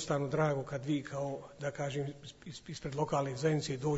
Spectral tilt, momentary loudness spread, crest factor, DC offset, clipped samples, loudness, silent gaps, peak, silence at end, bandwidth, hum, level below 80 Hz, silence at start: -6 dB/octave; 12 LU; 16 dB; under 0.1%; under 0.1%; -36 LUFS; none; -18 dBFS; 0 s; 8 kHz; none; -64 dBFS; 0 s